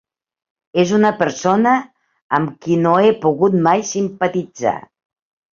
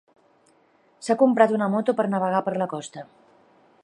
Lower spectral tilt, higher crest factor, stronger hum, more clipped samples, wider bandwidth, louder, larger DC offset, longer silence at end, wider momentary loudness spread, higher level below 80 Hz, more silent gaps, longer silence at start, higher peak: about the same, -6 dB/octave vs -6.5 dB/octave; about the same, 16 dB vs 20 dB; neither; neither; second, 7.4 kHz vs 11 kHz; first, -16 LUFS vs -22 LUFS; neither; about the same, 0.75 s vs 0.8 s; second, 8 LU vs 18 LU; first, -60 dBFS vs -78 dBFS; first, 2.22-2.30 s vs none; second, 0.75 s vs 1 s; about the same, -2 dBFS vs -4 dBFS